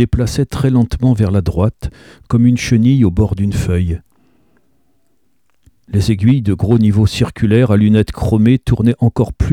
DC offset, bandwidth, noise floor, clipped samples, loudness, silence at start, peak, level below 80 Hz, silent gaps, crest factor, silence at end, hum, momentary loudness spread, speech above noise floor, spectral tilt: 0.2%; 14 kHz; -64 dBFS; under 0.1%; -14 LUFS; 0 s; 0 dBFS; -28 dBFS; none; 12 dB; 0 s; none; 6 LU; 52 dB; -7.5 dB/octave